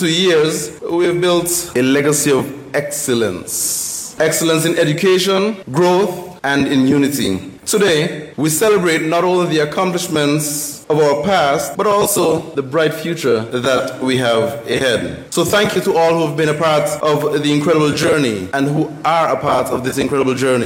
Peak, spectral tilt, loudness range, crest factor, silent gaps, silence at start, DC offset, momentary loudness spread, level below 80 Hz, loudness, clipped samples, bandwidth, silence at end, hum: -4 dBFS; -4 dB/octave; 1 LU; 12 dB; none; 0 s; under 0.1%; 6 LU; -52 dBFS; -15 LUFS; under 0.1%; 16.5 kHz; 0 s; none